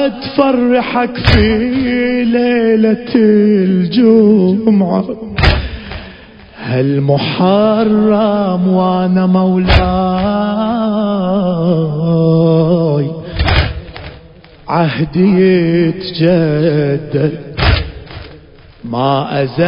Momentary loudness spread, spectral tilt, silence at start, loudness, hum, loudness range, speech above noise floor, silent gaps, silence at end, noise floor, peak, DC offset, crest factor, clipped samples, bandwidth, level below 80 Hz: 9 LU; -9 dB/octave; 0 s; -12 LUFS; none; 4 LU; 27 dB; none; 0 s; -38 dBFS; 0 dBFS; under 0.1%; 12 dB; under 0.1%; 5.4 kHz; -24 dBFS